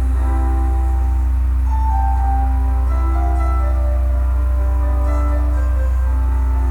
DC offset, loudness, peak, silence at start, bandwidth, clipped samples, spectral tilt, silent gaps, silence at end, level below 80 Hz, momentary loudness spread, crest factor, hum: under 0.1%; -18 LUFS; -6 dBFS; 0 s; 2.7 kHz; under 0.1%; -8.5 dB/octave; none; 0 s; -16 dBFS; 1 LU; 8 dB; 50 Hz at -50 dBFS